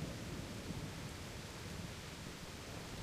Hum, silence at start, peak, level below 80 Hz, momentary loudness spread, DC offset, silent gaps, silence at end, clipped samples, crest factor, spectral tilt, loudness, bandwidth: none; 0 s; -32 dBFS; -56 dBFS; 3 LU; under 0.1%; none; 0 s; under 0.1%; 16 dB; -4.5 dB/octave; -47 LUFS; 15.5 kHz